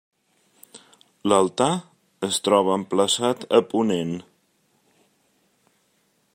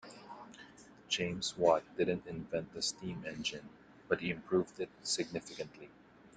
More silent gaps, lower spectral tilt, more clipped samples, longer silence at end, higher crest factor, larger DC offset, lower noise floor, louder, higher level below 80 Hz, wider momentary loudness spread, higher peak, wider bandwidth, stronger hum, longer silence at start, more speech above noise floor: neither; about the same, -4 dB/octave vs -3.5 dB/octave; neither; first, 2.15 s vs 0.1 s; about the same, 22 dB vs 24 dB; neither; first, -67 dBFS vs -57 dBFS; first, -22 LUFS vs -36 LUFS; about the same, -68 dBFS vs -68 dBFS; second, 11 LU vs 20 LU; first, -2 dBFS vs -14 dBFS; first, 16 kHz vs 9.6 kHz; neither; first, 0.75 s vs 0.05 s; first, 46 dB vs 21 dB